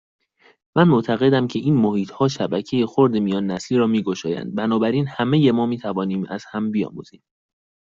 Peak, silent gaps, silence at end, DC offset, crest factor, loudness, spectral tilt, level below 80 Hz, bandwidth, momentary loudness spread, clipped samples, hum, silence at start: -4 dBFS; none; 0.75 s; under 0.1%; 18 dB; -20 LUFS; -7 dB/octave; -60 dBFS; 7.6 kHz; 9 LU; under 0.1%; none; 0.75 s